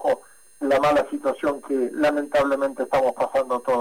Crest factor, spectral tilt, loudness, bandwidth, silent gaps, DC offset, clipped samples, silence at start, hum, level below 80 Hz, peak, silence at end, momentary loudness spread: 10 dB; -5 dB/octave; -23 LUFS; 16.5 kHz; none; 0.2%; under 0.1%; 0 s; none; -56 dBFS; -14 dBFS; 0 s; 6 LU